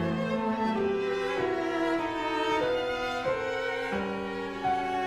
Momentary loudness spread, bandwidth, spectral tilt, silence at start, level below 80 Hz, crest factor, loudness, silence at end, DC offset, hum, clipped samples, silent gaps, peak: 4 LU; 13.5 kHz; -5.5 dB/octave; 0 s; -56 dBFS; 14 dB; -30 LUFS; 0 s; under 0.1%; none; under 0.1%; none; -16 dBFS